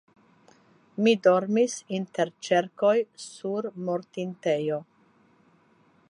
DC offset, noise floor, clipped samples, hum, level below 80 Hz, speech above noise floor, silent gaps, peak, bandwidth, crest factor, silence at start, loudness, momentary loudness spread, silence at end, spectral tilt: under 0.1%; -62 dBFS; under 0.1%; none; -80 dBFS; 36 dB; none; -8 dBFS; 11.5 kHz; 20 dB; 1 s; -26 LUFS; 13 LU; 1.3 s; -5 dB/octave